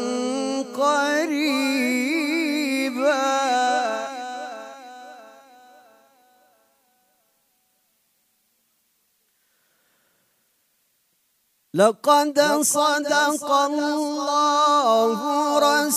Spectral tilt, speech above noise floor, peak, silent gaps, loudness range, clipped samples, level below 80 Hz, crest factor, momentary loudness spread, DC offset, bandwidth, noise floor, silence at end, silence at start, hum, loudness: -2.5 dB/octave; 48 dB; -4 dBFS; none; 11 LU; under 0.1%; -86 dBFS; 20 dB; 14 LU; under 0.1%; 15.5 kHz; -68 dBFS; 0 s; 0 s; none; -21 LUFS